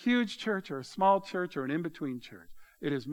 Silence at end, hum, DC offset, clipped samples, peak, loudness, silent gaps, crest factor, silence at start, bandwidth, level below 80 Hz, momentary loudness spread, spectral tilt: 0 s; none; under 0.1%; under 0.1%; -12 dBFS; -32 LUFS; none; 20 dB; 0 s; 13 kHz; -68 dBFS; 13 LU; -6 dB/octave